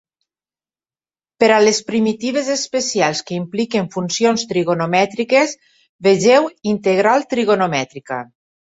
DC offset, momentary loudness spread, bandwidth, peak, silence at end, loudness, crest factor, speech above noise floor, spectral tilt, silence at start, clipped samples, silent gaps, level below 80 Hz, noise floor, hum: under 0.1%; 10 LU; 8 kHz; -2 dBFS; 0.4 s; -17 LUFS; 16 dB; over 74 dB; -4 dB/octave; 1.4 s; under 0.1%; 5.89-5.99 s; -62 dBFS; under -90 dBFS; none